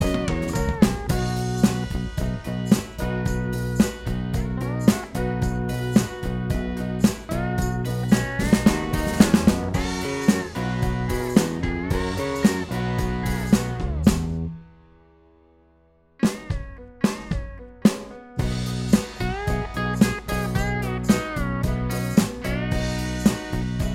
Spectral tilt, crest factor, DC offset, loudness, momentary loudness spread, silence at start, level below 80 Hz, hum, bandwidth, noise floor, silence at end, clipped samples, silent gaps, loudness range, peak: -6 dB/octave; 22 dB; under 0.1%; -24 LUFS; 7 LU; 0 s; -34 dBFS; none; 16.5 kHz; -58 dBFS; 0 s; under 0.1%; none; 5 LU; -2 dBFS